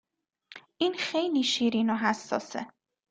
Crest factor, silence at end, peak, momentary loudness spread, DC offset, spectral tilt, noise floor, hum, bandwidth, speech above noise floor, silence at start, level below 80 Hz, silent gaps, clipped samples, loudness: 20 dB; 0.45 s; -10 dBFS; 12 LU; under 0.1%; -3.5 dB/octave; -57 dBFS; none; 9.2 kHz; 29 dB; 0.5 s; -74 dBFS; none; under 0.1%; -28 LUFS